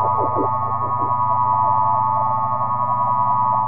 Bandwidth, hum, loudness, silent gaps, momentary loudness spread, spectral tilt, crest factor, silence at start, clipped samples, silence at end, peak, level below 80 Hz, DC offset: 2.8 kHz; none; -19 LUFS; none; 4 LU; -13.5 dB/octave; 12 dB; 0 s; under 0.1%; 0 s; -8 dBFS; -62 dBFS; 3%